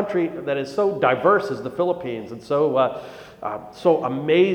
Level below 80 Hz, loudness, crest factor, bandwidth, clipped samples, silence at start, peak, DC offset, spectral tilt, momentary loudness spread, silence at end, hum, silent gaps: -62 dBFS; -22 LUFS; 16 dB; 10 kHz; under 0.1%; 0 s; -4 dBFS; under 0.1%; -7 dB/octave; 13 LU; 0 s; none; none